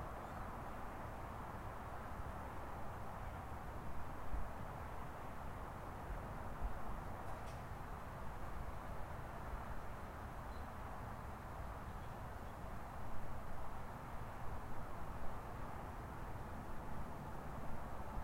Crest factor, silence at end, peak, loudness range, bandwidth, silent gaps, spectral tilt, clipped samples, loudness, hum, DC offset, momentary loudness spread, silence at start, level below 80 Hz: 16 dB; 0 s; -30 dBFS; 1 LU; 16 kHz; none; -6.5 dB/octave; under 0.1%; -50 LUFS; none; under 0.1%; 2 LU; 0 s; -52 dBFS